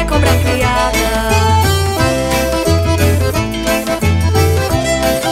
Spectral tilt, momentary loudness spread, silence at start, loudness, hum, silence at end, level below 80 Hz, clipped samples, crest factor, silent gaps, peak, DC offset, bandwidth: -5 dB/octave; 3 LU; 0 s; -13 LUFS; none; 0 s; -22 dBFS; under 0.1%; 12 dB; none; 0 dBFS; under 0.1%; 16.5 kHz